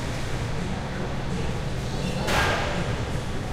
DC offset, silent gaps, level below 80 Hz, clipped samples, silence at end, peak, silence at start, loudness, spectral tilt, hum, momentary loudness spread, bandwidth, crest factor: under 0.1%; none; -34 dBFS; under 0.1%; 0 s; -10 dBFS; 0 s; -28 LUFS; -5 dB/octave; none; 7 LU; 16 kHz; 16 dB